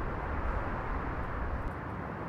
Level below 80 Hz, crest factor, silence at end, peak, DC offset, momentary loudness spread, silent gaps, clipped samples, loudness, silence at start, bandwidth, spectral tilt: -38 dBFS; 14 dB; 0 s; -20 dBFS; under 0.1%; 3 LU; none; under 0.1%; -37 LUFS; 0 s; 6.6 kHz; -8.5 dB/octave